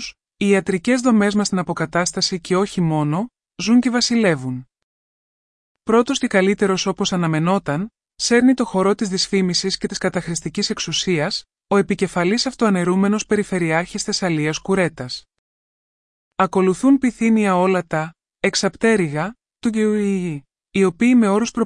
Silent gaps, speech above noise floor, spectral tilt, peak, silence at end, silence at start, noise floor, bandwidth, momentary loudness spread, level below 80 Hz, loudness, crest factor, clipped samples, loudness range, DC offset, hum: 4.83-5.75 s, 15.38-16.31 s; over 72 dB; -5 dB/octave; -4 dBFS; 0 s; 0 s; under -90 dBFS; 12 kHz; 10 LU; -52 dBFS; -19 LUFS; 16 dB; under 0.1%; 2 LU; under 0.1%; none